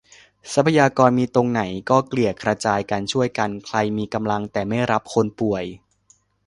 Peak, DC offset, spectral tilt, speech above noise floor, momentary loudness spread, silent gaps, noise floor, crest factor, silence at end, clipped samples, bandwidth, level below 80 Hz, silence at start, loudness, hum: 0 dBFS; under 0.1%; -6 dB/octave; 39 dB; 8 LU; none; -59 dBFS; 20 dB; 0.7 s; under 0.1%; 11.5 kHz; -54 dBFS; 0.45 s; -21 LUFS; none